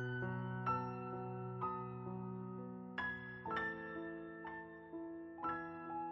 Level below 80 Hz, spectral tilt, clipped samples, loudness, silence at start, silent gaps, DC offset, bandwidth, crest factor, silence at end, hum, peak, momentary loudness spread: -72 dBFS; -5.5 dB/octave; under 0.1%; -45 LUFS; 0 s; none; under 0.1%; 5.8 kHz; 18 dB; 0 s; none; -26 dBFS; 8 LU